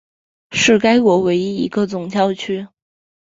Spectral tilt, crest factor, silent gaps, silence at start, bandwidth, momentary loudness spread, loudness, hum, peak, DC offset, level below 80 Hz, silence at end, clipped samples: -4.5 dB/octave; 16 dB; none; 0.5 s; 7.8 kHz; 11 LU; -16 LUFS; none; -2 dBFS; under 0.1%; -56 dBFS; 0.6 s; under 0.1%